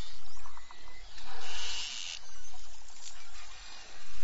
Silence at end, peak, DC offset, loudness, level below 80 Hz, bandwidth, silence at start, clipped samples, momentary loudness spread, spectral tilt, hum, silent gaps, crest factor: 0 s; -18 dBFS; 4%; -43 LUFS; -56 dBFS; 8 kHz; 0 s; under 0.1%; 16 LU; -0.5 dB/octave; none; none; 8 dB